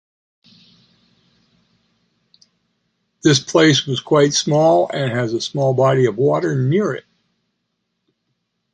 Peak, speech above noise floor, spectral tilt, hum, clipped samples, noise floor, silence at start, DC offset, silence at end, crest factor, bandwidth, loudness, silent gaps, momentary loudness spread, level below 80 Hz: -2 dBFS; 58 dB; -5 dB/octave; none; under 0.1%; -73 dBFS; 3.25 s; under 0.1%; 1.75 s; 18 dB; 9.8 kHz; -16 LUFS; none; 7 LU; -60 dBFS